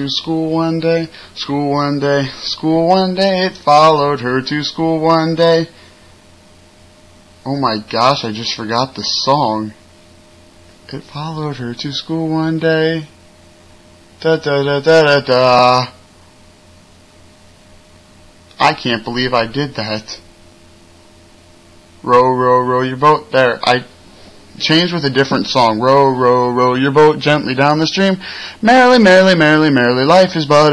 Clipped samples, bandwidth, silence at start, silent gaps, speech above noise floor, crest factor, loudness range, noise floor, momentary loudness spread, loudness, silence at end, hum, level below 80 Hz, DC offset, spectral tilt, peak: under 0.1%; 11 kHz; 0 s; none; 31 dB; 14 dB; 9 LU; -44 dBFS; 13 LU; -13 LUFS; 0 s; none; -50 dBFS; 0.1%; -5.5 dB/octave; -2 dBFS